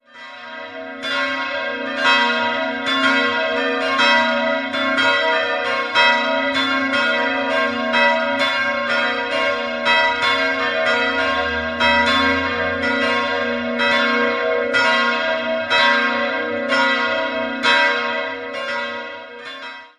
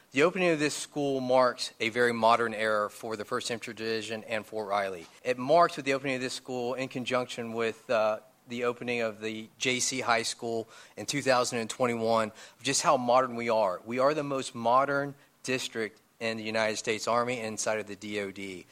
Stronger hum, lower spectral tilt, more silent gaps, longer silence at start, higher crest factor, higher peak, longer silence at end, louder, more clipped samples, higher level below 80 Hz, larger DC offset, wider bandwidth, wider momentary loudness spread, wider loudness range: neither; about the same, -3 dB/octave vs -3.5 dB/octave; neither; about the same, 0.15 s vs 0.15 s; about the same, 18 dB vs 20 dB; first, -2 dBFS vs -10 dBFS; about the same, 0.1 s vs 0.1 s; first, -17 LUFS vs -29 LUFS; neither; first, -50 dBFS vs -74 dBFS; neither; second, 12 kHz vs 16 kHz; about the same, 9 LU vs 11 LU; about the same, 2 LU vs 4 LU